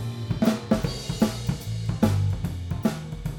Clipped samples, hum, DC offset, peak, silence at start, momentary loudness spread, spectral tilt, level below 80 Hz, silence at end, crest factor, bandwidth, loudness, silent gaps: under 0.1%; none; under 0.1%; -8 dBFS; 0 s; 7 LU; -6.5 dB/octave; -40 dBFS; 0 s; 18 dB; 17.5 kHz; -26 LUFS; none